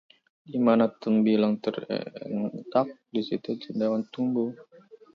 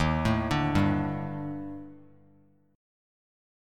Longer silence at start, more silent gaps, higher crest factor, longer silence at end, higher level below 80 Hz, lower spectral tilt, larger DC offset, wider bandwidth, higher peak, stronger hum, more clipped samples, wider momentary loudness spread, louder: first, 0.5 s vs 0 s; neither; about the same, 18 dB vs 20 dB; second, 0.5 s vs 1.75 s; second, -74 dBFS vs -44 dBFS; first, -8.5 dB/octave vs -7 dB/octave; neither; second, 5.6 kHz vs 13.5 kHz; first, -8 dBFS vs -12 dBFS; second, none vs 50 Hz at -55 dBFS; neither; second, 11 LU vs 16 LU; about the same, -27 LUFS vs -28 LUFS